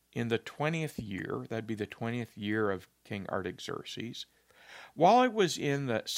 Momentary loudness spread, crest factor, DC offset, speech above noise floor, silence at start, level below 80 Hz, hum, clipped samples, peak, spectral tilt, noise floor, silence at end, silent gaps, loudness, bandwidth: 17 LU; 22 dB; under 0.1%; 22 dB; 0.15 s; -70 dBFS; none; under 0.1%; -10 dBFS; -5 dB/octave; -54 dBFS; 0 s; none; -32 LUFS; 16 kHz